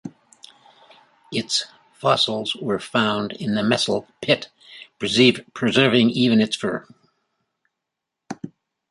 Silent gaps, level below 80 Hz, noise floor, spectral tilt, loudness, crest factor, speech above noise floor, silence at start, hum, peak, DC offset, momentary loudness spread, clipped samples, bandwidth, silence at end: none; -62 dBFS; -83 dBFS; -4.5 dB/octave; -20 LUFS; 20 dB; 63 dB; 0.05 s; none; -2 dBFS; under 0.1%; 21 LU; under 0.1%; 11.5 kHz; 0.45 s